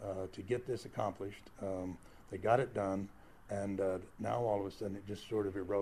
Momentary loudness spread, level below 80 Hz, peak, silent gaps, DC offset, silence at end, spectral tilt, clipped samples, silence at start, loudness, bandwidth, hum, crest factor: 13 LU; -64 dBFS; -16 dBFS; none; under 0.1%; 0 s; -7 dB/octave; under 0.1%; 0 s; -39 LUFS; 14.5 kHz; none; 22 dB